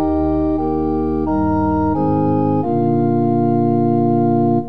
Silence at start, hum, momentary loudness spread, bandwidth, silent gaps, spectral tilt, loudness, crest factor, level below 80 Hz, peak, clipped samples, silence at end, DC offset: 0 s; none; 3 LU; 5 kHz; none; -12.5 dB/octave; -17 LUFS; 10 dB; -36 dBFS; -4 dBFS; under 0.1%; 0 s; 2%